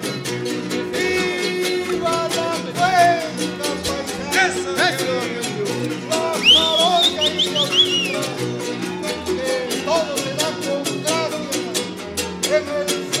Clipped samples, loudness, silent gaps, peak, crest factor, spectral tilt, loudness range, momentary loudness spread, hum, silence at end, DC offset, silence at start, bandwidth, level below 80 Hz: under 0.1%; -19 LUFS; none; -2 dBFS; 18 dB; -2.5 dB/octave; 6 LU; 10 LU; none; 0 s; under 0.1%; 0 s; 16.5 kHz; -52 dBFS